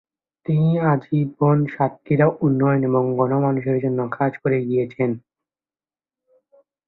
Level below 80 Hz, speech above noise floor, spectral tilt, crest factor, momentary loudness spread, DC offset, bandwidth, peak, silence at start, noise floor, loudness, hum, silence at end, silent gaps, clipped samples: -58 dBFS; over 71 dB; -12 dB/octave; 16 dB; 6 LU; under 0.1%; 4.1 kHz; -4 dBFS; 0.5 s; under -90 dBFS; -20 LUFS; none; 1.7 s; none; under 0.1%